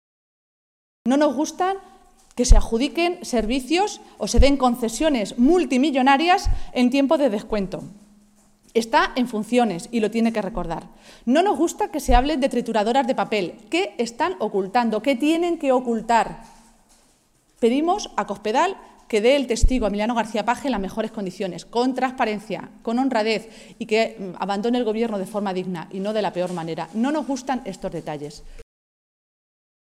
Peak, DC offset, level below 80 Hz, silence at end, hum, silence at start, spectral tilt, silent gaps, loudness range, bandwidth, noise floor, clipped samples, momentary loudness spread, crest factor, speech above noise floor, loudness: 0 dBFS; under 0.1%; -30 dBFS; 1.35 s; none; 1.05 s; -5 dB/octave; none; 5 LU; 15 kHz; -60 dBFS; under 0.1%; 11 LU; 22 dB; 39 dB; -22 LUFS